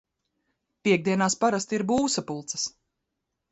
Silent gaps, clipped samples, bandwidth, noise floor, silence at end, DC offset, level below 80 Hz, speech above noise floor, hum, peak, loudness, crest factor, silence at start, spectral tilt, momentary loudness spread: none; under 0.1%; 8.2 kHz; -82 dBFS; 0.85 s; under 0.1%; -62 dBFS; 57 dB; none; -10 dBFS; -26 LUFS; 18 dB; 0.85 s; -4 dB/octave; 8 LU